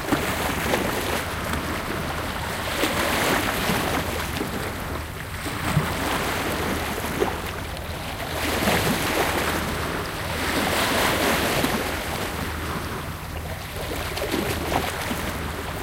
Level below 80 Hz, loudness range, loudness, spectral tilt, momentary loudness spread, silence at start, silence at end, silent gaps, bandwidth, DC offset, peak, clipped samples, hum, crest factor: -38 dBFS; 4 LU; -25 LUFS; -4 dB/octave; 9 LU; 0 s; 0 s; none; 17 kHz; under 0.1%; -8 dBFS; under 0.1%; none; 18 dB